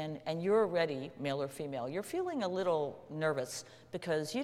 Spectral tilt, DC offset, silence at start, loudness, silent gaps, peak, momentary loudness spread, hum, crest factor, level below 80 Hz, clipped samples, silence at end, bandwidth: -5 dB/octave; under 0.1%; 0 s; -35 LUFS; none; -18 dBFS; 10 LU; none; 16 dB; -76 dBFS; under 0.1%; 0 s; 15.5 kHz